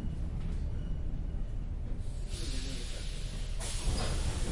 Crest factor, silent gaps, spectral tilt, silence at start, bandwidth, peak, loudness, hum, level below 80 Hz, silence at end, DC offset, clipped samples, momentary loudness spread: 14 dB; none; -4.5 dB/octave; 0 s; 11.5 kHz; -20 dBFS; -39 LUFS; none; -36 dBFS; 0 s; under 0.1%; under 0.1%; 6 LU